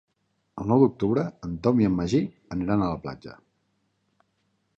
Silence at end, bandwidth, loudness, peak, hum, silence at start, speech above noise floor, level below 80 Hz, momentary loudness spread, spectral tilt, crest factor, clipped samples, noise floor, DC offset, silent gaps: 1.45 s; 7.8 kHz; -25 LUFS; -6 dBFS; none; 0.55 s; 49 dB; -50 dBFS; 17 LU; -8.5 dB/octave; 20 dB; under 0.1%; -73 dBFS; under 0.1%; none